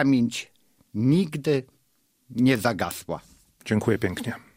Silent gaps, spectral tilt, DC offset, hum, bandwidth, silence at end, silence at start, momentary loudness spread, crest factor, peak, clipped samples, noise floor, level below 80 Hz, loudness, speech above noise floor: none; -6 dB/octave; under 0.1%; none; 16 kHz; 0.2 s; 0 s; 14 LU; 20 dB; -6 dBFS; under 0.1%; -68 dBFS; -58 dBFS; -25 LUFS; 44 dB